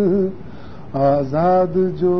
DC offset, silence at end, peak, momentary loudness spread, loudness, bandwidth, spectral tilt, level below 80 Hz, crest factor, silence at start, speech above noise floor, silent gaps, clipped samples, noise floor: 2%; 0 s; -6 dBFS; 21 LU; -18 LUFS; 6 kHz; -10.5 dB/octave; -46 dBFS; 12 dB; 0 s; 20 dB; none; under 0.1%; -36 dBFS